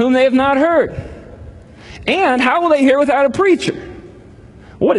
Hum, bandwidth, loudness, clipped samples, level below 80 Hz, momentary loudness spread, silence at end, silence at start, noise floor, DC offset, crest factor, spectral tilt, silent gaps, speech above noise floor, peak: none; 11 kHz; -14 LUFS; under 0.1%; -42 dBFS; 18 LU; 0 s; 0 s; -39 dBFS; under 0.1%; 14 dB; -5.5 dB/octave; none; 26 dB; 0 dBFS